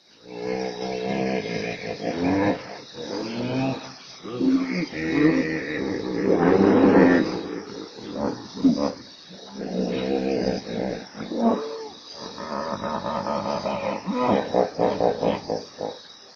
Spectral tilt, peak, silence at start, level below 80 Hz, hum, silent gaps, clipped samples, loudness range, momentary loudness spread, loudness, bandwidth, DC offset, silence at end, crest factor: -6.5 dB/octave; -4 dBFS; 0.25 s; -54 dBFS; none; none; under 0.1%; 7 LU; 16 LU; -24 LUFS; 7 kHz; under 0.1%; 0 s; 20 dB